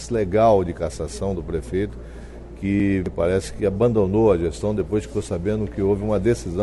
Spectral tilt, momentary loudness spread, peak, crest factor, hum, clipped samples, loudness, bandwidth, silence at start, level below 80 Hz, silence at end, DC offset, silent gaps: -7.5 dB/octave; 10 LU; -6 dBFS; 16 dB; none; under 0.1%; -22 LUFS; 11.5 kHz; 0 s; -36 dBFS; 0 s; under 0.1%; none